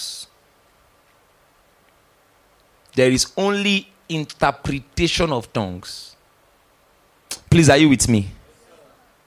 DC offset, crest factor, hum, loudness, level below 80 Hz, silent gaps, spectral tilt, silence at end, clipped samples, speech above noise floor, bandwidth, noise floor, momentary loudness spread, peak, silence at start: under 0.1%; 18 dB; none; -18 LUFS; -40 dBFS; none; -4.5 dB/octave; 0.9 s; under 0.1%; 39 dB; 16 kHz; -57 dBFS; 20 LU; -2 dBFS; 0 s